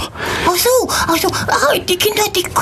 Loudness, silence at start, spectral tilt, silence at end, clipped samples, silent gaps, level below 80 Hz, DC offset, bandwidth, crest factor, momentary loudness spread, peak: -14 LUFS; 0 s; -2.5 dB/octave; 0 s; under 0.1%; none; -38 dBFS; under 0.1%; 14 kHz; 14 dB; 2 LU; -2 dBFS